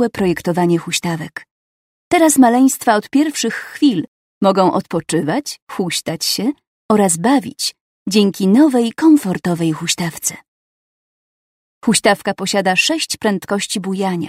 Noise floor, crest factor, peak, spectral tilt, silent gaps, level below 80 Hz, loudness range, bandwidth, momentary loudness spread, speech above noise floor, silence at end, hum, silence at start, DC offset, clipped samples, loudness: under -90 dBFS; 16 dB; 0 dBFS; -4 dB/octave; 1.51-2.11 s, 4.08-4.41 s, 5.62-5.67 s, 6.67-6.89 s, 7.81-8.06 s, 10.48-11.81 s; -56 dBFS; 4 LU; 16 kHz; 10 LU; over 75 dB; 0 s; none; 0 s; under 0.1%; under 0.1%; -16 LUFS